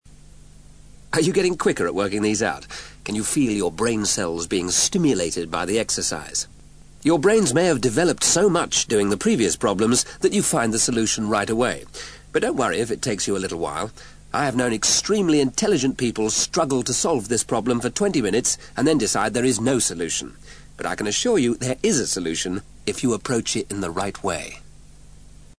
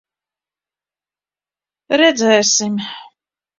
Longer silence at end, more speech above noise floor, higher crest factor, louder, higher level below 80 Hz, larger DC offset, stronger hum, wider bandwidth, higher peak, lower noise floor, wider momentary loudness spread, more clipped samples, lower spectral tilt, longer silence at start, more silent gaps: second, 0.2 s vs 0.55 s; second, 25 dB vs over 76 dB; about the same, 16 dB vs 20 dB; second, -21 LUFS vs -14 LUFS; first, -48 dBFS vs -64 dBFS; first, 0.3% vs under 0.1%; about the same, 50 Hz at -50 dBFS vs 50 Hz at -55 dBFS; first, 11 kHz vs 7.6 kHz; second, -6 dBFS vs 0 dBFS; second, -46 dBFS vs under -90 dBFS; second, 9 LU vs 16 LU; neither; first, -3.5 dB/octave vs -2 dB/octave; second, 0.4 s vs 1.9 s; neither